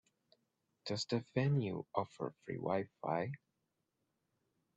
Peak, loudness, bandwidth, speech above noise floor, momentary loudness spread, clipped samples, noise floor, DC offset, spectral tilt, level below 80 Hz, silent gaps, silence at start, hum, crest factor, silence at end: -18 dBFS; -39 LUFS; 8.4 kHz; 47 dB; 10 LU; under 0.1%; -86 dBFS; under 0.1%; -6.5 dB/octave; -78 dBFS; none; 0.85 s; none; 22 dB; 1.4 s